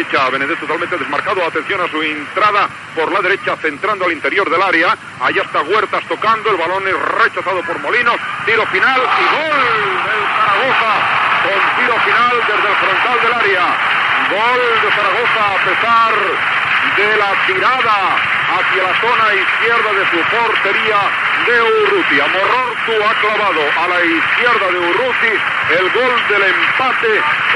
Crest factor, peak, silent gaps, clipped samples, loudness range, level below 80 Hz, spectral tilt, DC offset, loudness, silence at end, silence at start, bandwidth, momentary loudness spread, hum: 12 dB; 0 dBFS; none; under 0.1%; 3 LU; -60 dBFS; -3.5 dB/octave; under 0.1%; -13 LUFS; 0 s; 0 s; 11.5 kHz; 5 LU; none